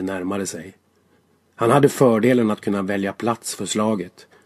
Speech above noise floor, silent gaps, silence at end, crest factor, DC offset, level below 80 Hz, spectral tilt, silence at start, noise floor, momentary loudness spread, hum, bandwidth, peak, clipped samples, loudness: 41 dB; none; 0.35 s; 20 dB; under 0.1%; -58 dBFS; -5.5 dB/octave; 0 s; -60 dBFS; 12 LU; none; 14.5 kHz; -2 dBFS; under 0.1%; -20 LUFS